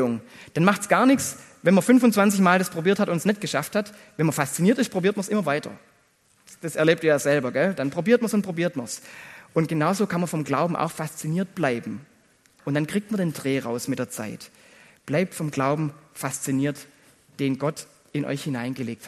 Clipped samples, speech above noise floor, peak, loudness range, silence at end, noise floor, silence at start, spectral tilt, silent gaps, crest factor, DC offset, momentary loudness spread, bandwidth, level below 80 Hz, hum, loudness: under 0.1%; 39 dB; -2 dBFS; 8 LU; 0 s; -62 dBFS; 0 s; -5.5 dB/octave; none; 22 dB; under 0.1%; 14 LU; 13 kHz; -66 dBFS; none; -24 LUFS